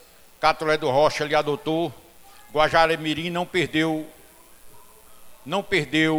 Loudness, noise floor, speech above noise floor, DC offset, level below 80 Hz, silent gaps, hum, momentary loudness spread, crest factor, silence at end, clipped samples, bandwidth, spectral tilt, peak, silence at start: -23 LUFS; -49 dBFS; 27 dB; under 0.1%; -50 dBFS; none; none; 9 LU; 22 dB; 0 s; under 0.1%; 17.5 kHz; -5 dB/octave; -2 dBFS; 0.4 s